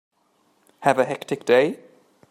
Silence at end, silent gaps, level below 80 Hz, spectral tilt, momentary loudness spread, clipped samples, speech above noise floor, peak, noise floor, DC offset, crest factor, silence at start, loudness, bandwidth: 0.55 s; none; -70 dBFS; -5 dB/octave; 8 LU; under 0.1%; 44 dB; -2 dBFS; -65 dBFS; under 0.1%; 20 dB; 0.8 s; -21 LUFS; 14.5 kHz